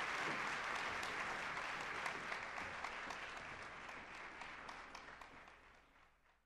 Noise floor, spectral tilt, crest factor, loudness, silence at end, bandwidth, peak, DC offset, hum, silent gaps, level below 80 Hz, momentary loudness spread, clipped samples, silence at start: -71 dBFS; -2 dB/octave; 22 dB; -45 LUFS; 0.35 s; 13 kHz; -24 dBFS; under 0.1%; none; none; -70 dBFS; 14 LU; under 0.1%; 0 s